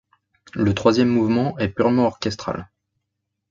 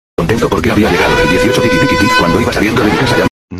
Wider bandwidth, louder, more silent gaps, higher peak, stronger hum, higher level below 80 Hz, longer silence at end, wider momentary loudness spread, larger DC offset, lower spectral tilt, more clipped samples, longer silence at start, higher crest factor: second, 7.4 kHz vs 14 kHz; second, -20 LUFS vs -10 LUFS; second, none vs 3.30-3.48 s; about the same, -2 dBFS vs 0 dBFS; neither; second, -48 dBFS vs -28 dBFS; first, 0.85 s vs 0 s; first, 12 LU vs 3 LU; neither; first, -7 dB/octave vs -5 dB/octave; neither; first, 0.55 s vs 0.2 s; first, 18 dB vs 10 dB